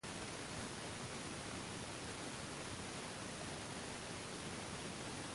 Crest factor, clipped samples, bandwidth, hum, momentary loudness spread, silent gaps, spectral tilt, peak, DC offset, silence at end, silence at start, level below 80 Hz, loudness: 16 dB; under 0.1%; 11.5 kHz; none; 0 LU; none; -3 dB/octave; -32 dBFS; under 0.1%; 0 s; 0.05 s; -64 dBFS; -46 LUFS